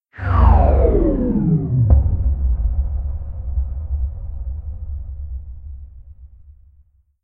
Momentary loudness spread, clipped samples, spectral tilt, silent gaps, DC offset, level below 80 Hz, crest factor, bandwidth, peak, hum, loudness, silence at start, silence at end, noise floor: 18 LU; under 0.1%; -12 dB/octave; none; under 0.1%; -20 dBFS; 16 dB; 3.1 kHz; -2 dBFS; none; -19 LUFS; 0.15 s; 0.95 s; -54 dBFS